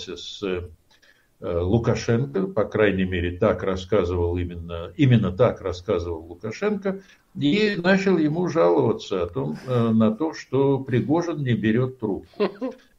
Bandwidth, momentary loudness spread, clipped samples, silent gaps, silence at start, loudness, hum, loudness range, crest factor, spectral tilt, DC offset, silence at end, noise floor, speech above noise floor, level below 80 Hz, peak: 7.6 kHz; 12 LU; under 0.1%; none; 0 s; -23 LUFS; none; 2 LU; 18 dB; -7.5 dB/octave; under 0.1%; 0.25 s; -58 dBFS; 35 dB; -46 dBFS; -6 dBFS